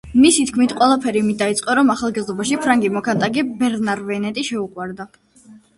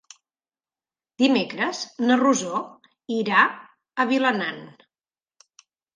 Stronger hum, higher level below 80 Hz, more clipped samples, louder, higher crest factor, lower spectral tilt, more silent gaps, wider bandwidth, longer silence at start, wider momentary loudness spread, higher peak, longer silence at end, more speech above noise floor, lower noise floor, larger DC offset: neither; first, -52 dBFS vs -78 dBFS; neither; first, -18 LUFS vs -22 LUFS; about the same, 16 dB vs 20 dB; about the same, -4 dB/octave vs -3.5 dB/octave; neither; first, 11.5 kHz vs 9.8 kHz; second, 0.05 s vs 1.2 s; about the same, 11 LU vs 13 LU; about the same, -2 dBFS vs -4 dBFS; second, 0.2 s vs 1.25 s; second, 29 dB vs over 68 dB; second, -47 dBFS vs under -90 dBFS; neither